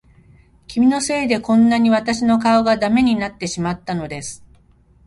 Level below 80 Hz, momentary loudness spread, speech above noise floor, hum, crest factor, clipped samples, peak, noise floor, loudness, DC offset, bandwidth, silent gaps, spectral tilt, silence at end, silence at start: -48 dBFS; 11 LU; 36 dB; none; 14 dB; under 0.1%; -4 dBFS; -52 dBFS; -17 LUFS; under 0.1%; 11.5 kHz; none; -5 dB/octave; 0.7 s; 0.7 s